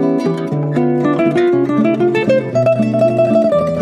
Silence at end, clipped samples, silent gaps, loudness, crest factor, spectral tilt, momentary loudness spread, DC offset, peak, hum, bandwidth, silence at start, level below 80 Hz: 0 s; under 0.1%; none; -14 LUFS; 10 dB; -8.5 dB/octave; 4 LU; under 0.1%; -2 dBFS; none; 10.5 kHz; 0 s; -52 dBFS